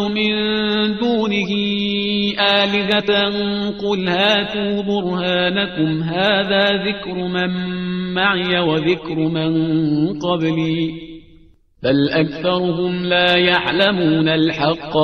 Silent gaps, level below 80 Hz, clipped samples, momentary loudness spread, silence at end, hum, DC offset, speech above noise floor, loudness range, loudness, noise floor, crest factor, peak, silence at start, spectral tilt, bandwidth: none; -48 dBFS; under 0.1%; 6 LU; 0 s; none; 0.2%; 31 dB; 3 LU; -17 LUFS; -49 dBFS; 18 dB; 0 dBFS; 0 s; -6.5 dB/octave; 6.6 kHz